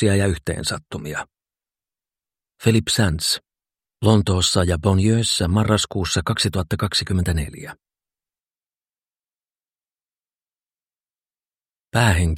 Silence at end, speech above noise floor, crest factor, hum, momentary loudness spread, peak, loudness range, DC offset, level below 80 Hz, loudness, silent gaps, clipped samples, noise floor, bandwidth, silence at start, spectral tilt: 0 s; over 71 dB; 22 dB; none; 12 LU; 0 dBFS; 9 LU; under 0.1%; -38 dBFS; -20 LUFS; 8.66-8.70 s; under 0.1%; under -90 dBFS; 16 kHz; 0 s; -4.5 dB/octave